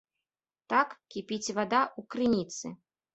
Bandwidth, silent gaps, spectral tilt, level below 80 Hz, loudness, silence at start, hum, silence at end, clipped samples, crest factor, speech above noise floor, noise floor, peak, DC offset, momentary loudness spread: 8.2 kHz; none; -4 dB/octave; -70 dBFS; -30 LUFS; 0.7 s; none; 0.4 s; under 0.1%; 22 dB; over 60 dB; under -90 dBFS; -10 dBFS; under 0.1%; 12 LU